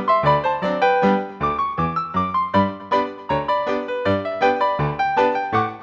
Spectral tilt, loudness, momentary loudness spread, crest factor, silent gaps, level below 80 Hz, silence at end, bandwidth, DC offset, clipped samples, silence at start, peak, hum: -7.5 dB/octave; -20 LUFS; 5 LU; 16 dB; none; -48 dBFS; 0 s; 7.8 kHz; under 0.1%; under 0.1%; 0 s; -4 dBFS; none